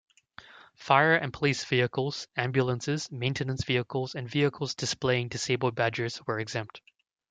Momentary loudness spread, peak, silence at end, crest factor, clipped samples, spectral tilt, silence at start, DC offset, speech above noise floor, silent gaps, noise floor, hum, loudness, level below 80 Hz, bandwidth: 9 LU; -6 dBFS; 0.5 s; 22 dB; under 0.1%; -5 dB/octave; 0.5 s; under 0.1%; 24 dB; none; -53 dBFS; none; -28 LUFS; -62 dBFS; 9.4 kHz